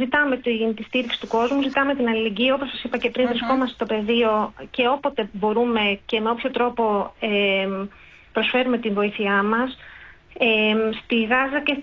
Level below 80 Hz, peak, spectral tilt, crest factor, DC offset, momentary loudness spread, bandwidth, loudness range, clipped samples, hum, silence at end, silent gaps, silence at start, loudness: -54 dBFS; -8 dBFS; -6 dB/octave; 14 dB; under 0.1%; 5 LU; 7.2 kHz; 1 LU; under 0.1%; none; 0 s; none; 0 s; -22 LUFS